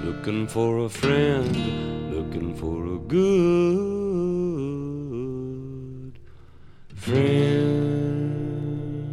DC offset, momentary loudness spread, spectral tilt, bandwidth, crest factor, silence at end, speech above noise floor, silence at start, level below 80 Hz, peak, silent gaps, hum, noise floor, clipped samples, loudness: under 0.1%; 13 LU; -7.5 dB/octave; 13 kHz; 18 dB; 0 s; 22 dB; 0 s; -46 dBFS; -6 dBFS; none; none; -44 dBFS; under 0.1%; -24 LUFS